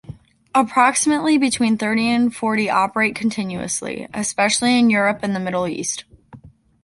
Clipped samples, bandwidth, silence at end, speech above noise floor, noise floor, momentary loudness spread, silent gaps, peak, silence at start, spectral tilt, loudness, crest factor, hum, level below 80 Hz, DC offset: under 0.1%; 11.5 kHz; 0.35 s; 26 dB; -45 dBFS; 9 LU; none; -2 dBFS; 0.1 s; -3.5 dB/octave; -18 LUFS; 18 dB; none; -56 dBFS; under 0.1%